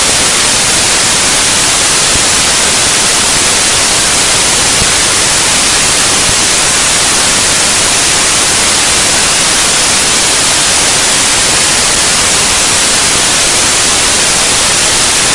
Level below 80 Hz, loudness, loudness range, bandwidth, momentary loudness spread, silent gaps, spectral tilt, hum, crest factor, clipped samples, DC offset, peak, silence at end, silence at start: -30 dBFS; -6 LUFS; 0 LU; 12 kHz; 0 LU; none; 0 dB/octave; none; 8 dB; 0.4%; under 0.1%; 0 dBFS; 0 s; 0 s